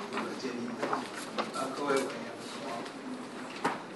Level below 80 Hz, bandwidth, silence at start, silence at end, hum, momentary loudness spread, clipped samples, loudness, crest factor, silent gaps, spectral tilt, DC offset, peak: -80 dBFS; 11.5 kHz; 0 s; 0 s; none; 10 LU; under 0.1%; -36 LUFS; 20 dB; none; -3.5 dB/octave; under 0.1%; -14 dBFS